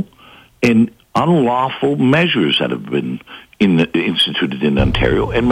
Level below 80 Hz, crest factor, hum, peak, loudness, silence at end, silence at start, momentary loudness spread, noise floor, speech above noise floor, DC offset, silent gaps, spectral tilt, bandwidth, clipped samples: -32 dBFS; 14 dB; none; -2 dBFS; -15 LUFS; 0 s; 0 s; 7 LU; -44 dBFS; 30 dB; under 0.1%; none; -6.5 dB/octave; 12 kHz; under 0.1%